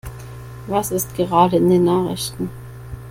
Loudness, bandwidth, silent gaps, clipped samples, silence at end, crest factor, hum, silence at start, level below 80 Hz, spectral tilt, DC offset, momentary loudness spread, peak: -18 LUFS; 16.5 kHz; none; under 0.1%; 0 s; 18 dB; none; 0.05 s; -42 dBFS; -6 dB/octave; under 0.1%; 21 LU; -2 dBFS